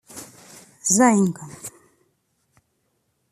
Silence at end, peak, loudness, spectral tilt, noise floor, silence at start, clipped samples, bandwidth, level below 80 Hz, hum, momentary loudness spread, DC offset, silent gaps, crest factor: 1.6 s; -4 dBFS; -19 LUFS; -4.5 dB/octave; -71 dBFS; 0.15 s; under 0.1%; 14.5 kHz; -68 dBFS; none; 24 LU; under 0.1%; none; 22 dB